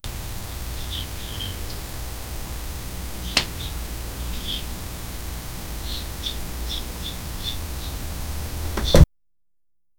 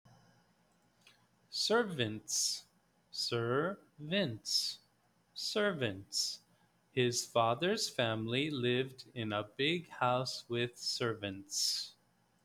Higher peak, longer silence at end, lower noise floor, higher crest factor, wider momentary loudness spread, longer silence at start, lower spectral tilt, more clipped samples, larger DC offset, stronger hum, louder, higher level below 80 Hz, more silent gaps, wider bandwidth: first, 0 dBFS vs -16 dBFS; first, 0.95 s vs 0.55 s; first, -84 dBFS vs -73 dBFS; first, 26 dB vs 20 dB; about the same, 12 LU vs 10 LU; second, 0.05 s vs 1.5 s; about the same, -4.5 dB/octave vs -3.5 dB/octave; neither; neither; neither; first, -27 LUFS vs -35 LUFS; first, -30 dBFS vs -76 dBFS; neither; about the same, over 20 kHz vs 19.5 kHz